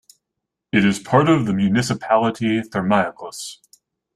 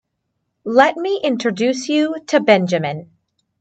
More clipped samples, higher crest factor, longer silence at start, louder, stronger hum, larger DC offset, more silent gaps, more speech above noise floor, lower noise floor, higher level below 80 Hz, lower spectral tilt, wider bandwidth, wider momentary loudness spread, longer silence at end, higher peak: neither; about the same, 18 dB vs 18 dB; about the same, 0.75 s vs 0.65 s; about the same, -19 LUFS vs -17 LUFS; neither; neither; neither; first, 63 dB vs 57 dB; first, -81 dBFS vs -73 dBFS; first, -54 dBFS vs -68 dBFS; about the same, -6 dB/octave vs -5 dB/octave; first, 13 kHz vs 8.8 kHz; first, 15 LU vs 9 LU; about the same, 0.6 s vs 0.55 s; about the same, -2 dBFS vs 0 dBFS